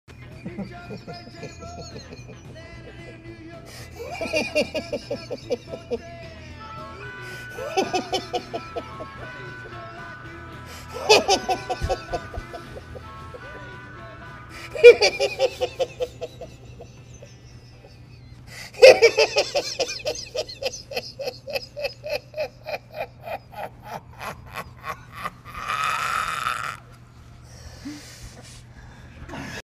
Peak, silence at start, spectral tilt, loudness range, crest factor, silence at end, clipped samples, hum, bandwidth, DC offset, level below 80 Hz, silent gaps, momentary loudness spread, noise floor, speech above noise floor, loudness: 0 dBFS; 0.1 s; -3 dB/octave; 15 LU; 26 dB; 0.05 s; under 0.1%; none; 15.5 kHz; under 0.1%; -48 dBFS; none; 23 LU; -46 dBFS; 23 dB; -22 LUFS